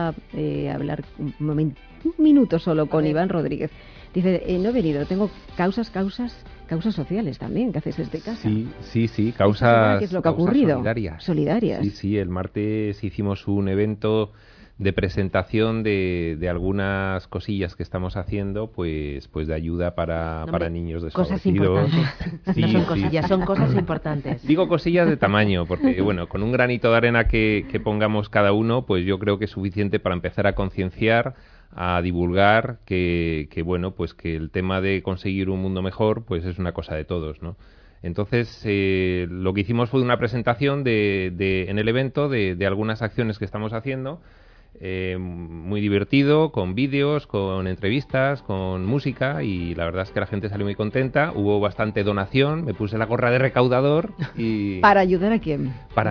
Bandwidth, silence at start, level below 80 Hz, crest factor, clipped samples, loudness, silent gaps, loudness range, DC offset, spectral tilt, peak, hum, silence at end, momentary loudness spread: 5.4 kHz; 0 s; -42 dBFS; 18 dB; under 0.1%; -23 LUFS; none; 6 LU; under 0.1%; -9 dB/octave; -4 dBFS; none; 0 s; 10 LU